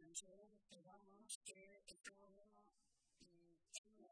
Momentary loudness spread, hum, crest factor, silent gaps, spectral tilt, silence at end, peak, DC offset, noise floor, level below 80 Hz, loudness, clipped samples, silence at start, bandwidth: 14 LU; none; 26 dB; 1.35-1.41 s, 3.78-3.84 s; -0.5 dB/octave; 0 s; -38 dBFS; under 0.1%; -83 dBFS; -88 dBFS; -58 LUFS; under 0.1%; 0 s; 11 kHz